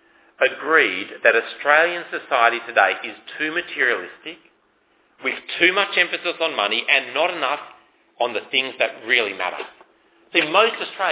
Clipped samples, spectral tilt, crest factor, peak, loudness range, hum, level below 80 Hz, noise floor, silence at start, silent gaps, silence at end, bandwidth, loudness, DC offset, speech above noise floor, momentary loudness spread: under 0.1%; -5.5 dB/octave; 22 dB; 0 dBFS; 4 LU; none; -76 dBFS; -62 dBFS; 0.4 s; none; 0 s; 4 kHz; -19 LUFS; under 0.1%; 41 dB; 11 LU